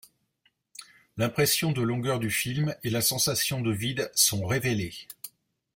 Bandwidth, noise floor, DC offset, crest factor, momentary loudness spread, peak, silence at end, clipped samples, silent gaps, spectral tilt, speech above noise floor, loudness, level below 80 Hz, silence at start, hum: 16.5 kHz; -71 dBFS; under 0.1%; 20 dB; 21 LU; -8 dBFS; 0.5 s; under 0.1%; none; -3.5 dB/octave; 44 dB; -26 LUFS; -60 dBFS; 0.8 s; none